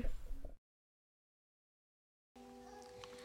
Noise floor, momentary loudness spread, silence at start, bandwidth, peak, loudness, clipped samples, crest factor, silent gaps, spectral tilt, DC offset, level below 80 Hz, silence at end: under -90 dBFS; 9 LU; 0 s; 10.5 kHz; -28 dBFS; -55 LUFS; under 0.1%; 20 dB; 0.58-2.35 s; -5 dB/octave; under 0.1%; -50 dBFS; 0 s